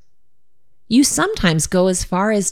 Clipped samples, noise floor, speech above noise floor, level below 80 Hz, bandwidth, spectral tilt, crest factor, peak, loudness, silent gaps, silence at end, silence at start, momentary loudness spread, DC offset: under 0.1%; -73 dBFS; 57 dB; -38 dBFS; 17 kHz; -4 dB/octave; 16 dB; -2 dBFS; -16 LUFS; none; 0 s; 0.9 s; 3 LU; under 0.1%